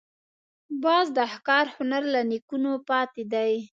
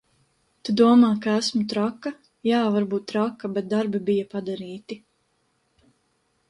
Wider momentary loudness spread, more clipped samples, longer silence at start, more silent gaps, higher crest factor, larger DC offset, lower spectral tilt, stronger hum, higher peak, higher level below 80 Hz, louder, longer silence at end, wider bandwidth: second, 6 LU vs 18 LU; neither; about the same, 0.7 s vs 0.65 s; first, 2.42-2.48 s vs none; about the same, 18 dB vs 20 dB; neither; second, -4.5 dB/octave vs -6 dB/octave; neither; about the same, -8 dBFS vs -6 dBFS; second, -80 dBFS vs -68 dBFS; about the same, -25 LUFS vs -23 LUFS; second, 0.1 s vs 1.55 s; second, 7.6 kHz vs 11.5 kHz